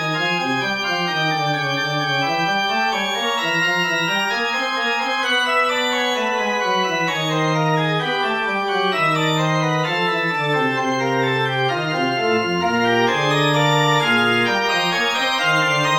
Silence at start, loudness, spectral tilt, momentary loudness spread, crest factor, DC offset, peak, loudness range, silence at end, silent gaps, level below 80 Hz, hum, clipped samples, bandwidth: 0 s; -18 LUFS; -4 dB/octave; 4 LU; 14 dB; under 0.1%; -6 dBFS; 2 LU; 0 s; none; -62 dBFS; none; under 0.1%; 17 kHz